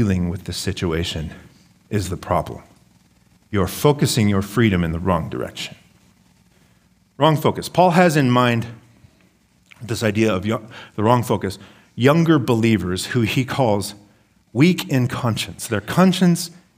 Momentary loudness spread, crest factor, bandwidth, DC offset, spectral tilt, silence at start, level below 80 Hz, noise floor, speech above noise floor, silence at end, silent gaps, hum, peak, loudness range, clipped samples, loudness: 13 LU; 18 dB; 16 kHz; under 0.1%; -6 dB/octave; 0 s; -46 dBFS; -57 dBFS; 39 dB; 0.25 s; none; none; 0 dBFS; 4 LU; under 0.1%; -19 LUFS